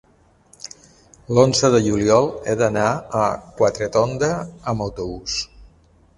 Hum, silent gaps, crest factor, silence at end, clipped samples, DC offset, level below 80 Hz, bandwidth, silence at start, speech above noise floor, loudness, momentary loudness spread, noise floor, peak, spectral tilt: none; none; 20 dB; 0.5 s; under 0.1%; under 0.1%; -46 dBFS; 11.5 kHz; 1.3 s; 35 dB; -19 LUFS; 14 LU; -54 dBFS; 0 dBFS; -5 dB/octave